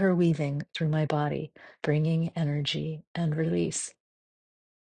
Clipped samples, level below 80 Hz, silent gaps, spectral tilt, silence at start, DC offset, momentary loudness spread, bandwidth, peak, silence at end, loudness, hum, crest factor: under 0.1%; -64 dBFS; 3.07-3.14 s; -6 dB/octave; 0 s; under 0.1%; 9 LU; 9.8 kHz; -12 dBFS; 0.95 s; -29 LUFS; none; 16 dB